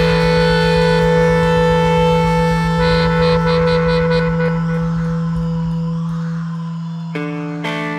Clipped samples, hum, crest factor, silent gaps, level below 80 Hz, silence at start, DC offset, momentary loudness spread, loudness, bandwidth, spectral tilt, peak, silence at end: under 0.1%; none; 12 dB; none; -30 dBFS; 0 s; under 0.1%; 10 LU; -16 LUFS; 10 kHz; -7 dB/octave; -2 dBFS; 0 s